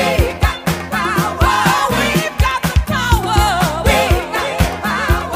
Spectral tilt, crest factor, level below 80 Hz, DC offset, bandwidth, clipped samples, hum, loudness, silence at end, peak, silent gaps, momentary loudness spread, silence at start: -4.5 dB/octave; 14 dB; -22 dBFS; under 0.1%; 16 kHz; under 0.1%; none; -15 LUFS; 0 s; 0 dBFS; none; 4 LU; 0 s